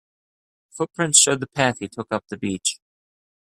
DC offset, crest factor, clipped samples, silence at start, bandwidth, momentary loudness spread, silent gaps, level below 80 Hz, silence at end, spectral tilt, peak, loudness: under 0.1%; 24 dB; under 0.1%; 0.75 s; 15.5 kHz; 15 LU; none; -64 dBFS; 0.8 s; -2 dB/octave; 0 dBFS; -20 LUFS